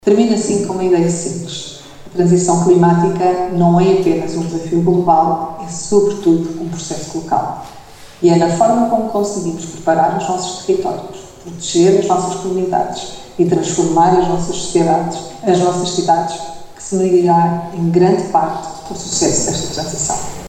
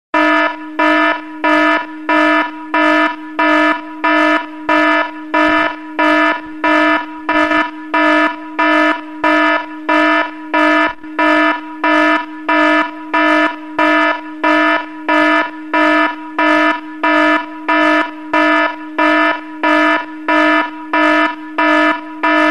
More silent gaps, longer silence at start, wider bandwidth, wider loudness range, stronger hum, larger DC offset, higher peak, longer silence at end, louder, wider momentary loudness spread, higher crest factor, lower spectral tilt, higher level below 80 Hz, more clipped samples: neither; about the same, 0.05 s vs 0.15 s; about the same, 11 kHz vs 10.5 kHz; about the same, 3 LU vs 1 LU; neither; second, under 0.1% vs 1%; about the same, 0 dBFS vs -2 dBFS; about the same, 0 s vs 0 s; about the same, -15 LUFS vs -13 LUFS; first, 13 LU vs 6 LU; about the same, 14 dB vs 12 dB; first, -5.5 dB/octave vs -3.5 dB/octave; first, -44 dBFS vs -54 dBFS; neither